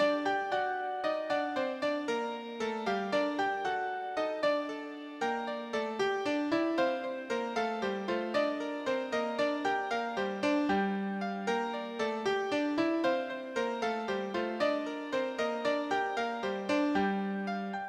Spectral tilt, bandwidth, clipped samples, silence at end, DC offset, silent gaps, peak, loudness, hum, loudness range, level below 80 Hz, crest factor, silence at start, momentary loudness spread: -5 dB/octave; 11 kHz; under 0.1%; 0 s; under 0.1%; none; -16 dBFS; -33 LUFS; none; 1 LU; -72 dBFS; 16 dB; 0 s; 5 LU